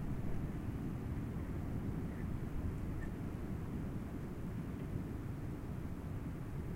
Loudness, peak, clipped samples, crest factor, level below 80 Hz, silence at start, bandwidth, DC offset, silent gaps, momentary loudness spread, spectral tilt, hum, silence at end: -43 LUFS; -28 dBFS; under 0.1%; 12 dB; -48 dBFS; 0 s; 16 kHz; under 0.1%; none; 3 LU; -8.5 dB/octave; none; 0 s